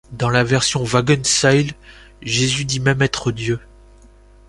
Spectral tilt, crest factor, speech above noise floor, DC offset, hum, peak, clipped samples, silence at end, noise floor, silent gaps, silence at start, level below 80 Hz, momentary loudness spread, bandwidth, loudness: -4 dB/octave; 18 dB; 28 dB; under 0.1%; none; -2 dBFS; under 0.1%; 0.9 s; -46 dBFS; none; 0.1 s; -44 dBFS; 10 LU; 11.5 kHz; -17 LUFS